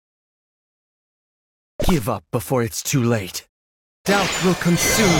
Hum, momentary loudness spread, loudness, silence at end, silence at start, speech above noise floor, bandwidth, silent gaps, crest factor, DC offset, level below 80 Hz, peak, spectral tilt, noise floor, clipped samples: none; 9 LU; -20 LUFS; 0 s; 1.8 s; over 71 dB; 17 kHz; 3.49-4.04 s; 18 dB; under 0.1%; -36 dBFS; -4 dBFS; -4 dB/octave; under -90 dBFS; under 0.1%